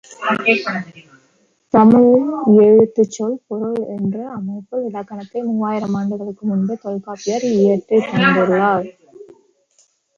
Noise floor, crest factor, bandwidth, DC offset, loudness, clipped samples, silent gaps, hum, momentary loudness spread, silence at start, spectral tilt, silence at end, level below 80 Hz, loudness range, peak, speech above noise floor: -59 dBFS; 16 dB; 7.4 kHz; under 0.1%; -16 LUFS; under 0.1%; none; none; 15 LU; 0.1 s; -6.5 dB/octave; 0.95 s; -58 dBFS; 9 LU; -2 dBFS; 44 dB